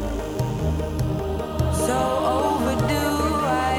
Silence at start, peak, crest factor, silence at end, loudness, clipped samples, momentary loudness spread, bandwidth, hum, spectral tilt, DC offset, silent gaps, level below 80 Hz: 0 s; -8 dBFS; 14 dB; 0 s; -23 LUFS; under 0.1%; 5 LU; 19.5 kHz; none; -5.5 dB/octave; under 0.1%; none; -32 dBFS